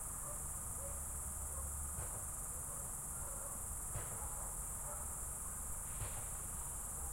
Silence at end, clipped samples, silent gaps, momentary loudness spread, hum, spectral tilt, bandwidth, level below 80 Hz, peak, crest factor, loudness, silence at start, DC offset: 0 s; under 0.1%; none; 1 LU; none; -3 dB/octave; 16.5 kHz; -52 dBFS; -30 dBFS; 14 dB; -43 LUFS; 0 s; under 0.1%